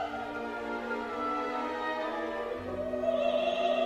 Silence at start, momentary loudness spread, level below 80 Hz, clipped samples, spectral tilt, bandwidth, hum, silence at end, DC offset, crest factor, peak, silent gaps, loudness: 0 s; 7 LU; -60 dBFS; under 0.1%; -5 dB/octave; 13 kHz; none; 0 s; under 0.1%; 16 dB; -16 dBFS; none; -33 LUFS